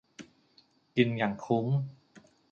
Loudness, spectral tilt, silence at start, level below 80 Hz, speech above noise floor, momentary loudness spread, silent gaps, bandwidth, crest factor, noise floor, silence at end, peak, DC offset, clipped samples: -30 LUFS; -7.5 dB/octave; 0.2 s; -70 dBFS; 37 dB; 20 LU; none; 7.4 kHz; 22 dB; -66 dBFS; 0.3 s; -10 dBFS; under 0.1%; under 0.1%